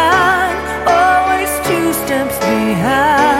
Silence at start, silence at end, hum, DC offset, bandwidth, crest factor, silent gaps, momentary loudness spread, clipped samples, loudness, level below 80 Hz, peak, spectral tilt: 0 s; 0 s; none; under 0.1%; 16.5 kHz; 12 dB; none; 6 LU; under 0.1%; -13 LUFS; -36 dBFS; 0 dBFS; -4 dB/octave